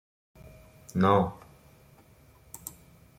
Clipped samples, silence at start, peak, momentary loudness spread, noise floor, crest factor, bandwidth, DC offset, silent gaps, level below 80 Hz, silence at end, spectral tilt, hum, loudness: under 0.1%; 0.95 s; -8 dBFS; 26 LU; -58 dBFS; 24 dB; 16.5 kHz; under 0.1%; none; -60 dBFS; 0.5 s; -6.5 dB/octave; none; -26 LUFS